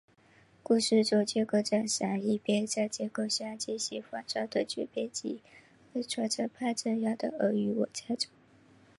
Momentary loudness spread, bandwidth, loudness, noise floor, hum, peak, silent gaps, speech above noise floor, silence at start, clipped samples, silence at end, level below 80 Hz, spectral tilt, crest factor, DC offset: 9 LU; 11.5 kHz; -31 LUFS; -62 dBFS; none; -14 dBFS; none; 31 dB; 0.7 s; under 0.1%; 0.7 s; -76 dBFS; -4 dB/octave; 18 dB; under 0.1%